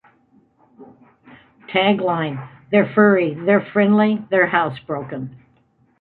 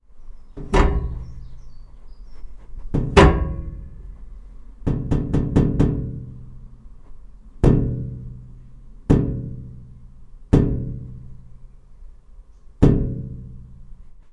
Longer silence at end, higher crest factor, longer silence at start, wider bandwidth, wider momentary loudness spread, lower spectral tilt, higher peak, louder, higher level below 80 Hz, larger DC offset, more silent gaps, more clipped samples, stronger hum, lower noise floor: first, 0.65 s vs 0 s; about the same, 18 dB vs 22 dB; first, 0.8 s vs 0.15 s; second, 4.3 kHz vs 10.5 kHz; second, 14 LU vs 24 LU; first, -10 dB/octave vs -7.5 dB/octave; about the same, -2 dBFS vs 0 dBFS; first, -18 LUFS vs -21 LUFS; second, -64 dBFS vs -28 dBFS; neither; neither; neither; neither; first, -59 dBFS vs -44 dBFS